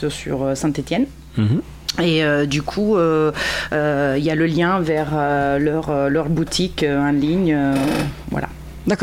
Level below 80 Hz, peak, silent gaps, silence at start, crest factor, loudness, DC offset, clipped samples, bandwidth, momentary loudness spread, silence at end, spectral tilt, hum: -40 dBFS; -4 dBFS; none; 0 s; 14 dB; -19 LUFS; under 0.1%; under 0.1%; 16 kHz; 6 LU; 0 s; -6 dB/octave; none